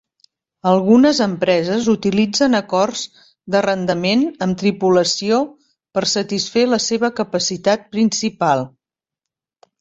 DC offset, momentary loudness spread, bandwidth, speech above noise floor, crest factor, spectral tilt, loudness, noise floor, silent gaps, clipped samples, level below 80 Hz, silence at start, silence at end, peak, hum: under 0.1%; 6 LU; 8 kHz; 68 dB; 16 dB; -4.5 dB/octave; -17 LUFS; -85 dBFS; none; under 0.1%; -58 dBFS; 0.65 s; 1.1 s; -2 dBFS; none